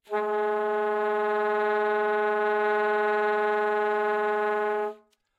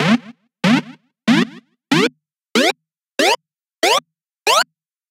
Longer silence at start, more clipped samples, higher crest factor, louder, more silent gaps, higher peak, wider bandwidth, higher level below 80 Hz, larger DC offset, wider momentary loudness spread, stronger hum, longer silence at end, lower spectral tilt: about the same, 0.1 s vs 0 s; neither; about the same, 14 dB vs 18 dB; second, -26 LUFS vs -17 LUFS; neither; second, -12 dBFS vs 0 dBFS; second, 7.6 kHz vs 16.5 kHz; second, under -90 dBFS vs -66 dBFS; neither; second, 2 LU vs 8 LU; neither; about the same, 0.45 s vs 0.5 s; first, -5 dB/octave vs -3.5 dB/octave